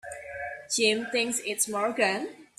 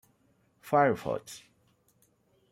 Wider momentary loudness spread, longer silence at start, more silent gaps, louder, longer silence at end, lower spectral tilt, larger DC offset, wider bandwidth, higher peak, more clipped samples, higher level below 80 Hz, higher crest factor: second, 13 LU vs 22 LU; second, 0.05 s vs 0.65 s; neither; about the same, -27 LUFS vs -29 LUFS; second, 0.15 s vs 1.15 s; second, -1.5 dB/octave vs -6 dB/octave; neither; about the same, 15.5 kHz vs 16 kHz; about the same, -8 dBFS vs -10 dBFS; neither; about the same, -68 dBFS vs -70 dBFS; about the same, 20 dB vs 22 dB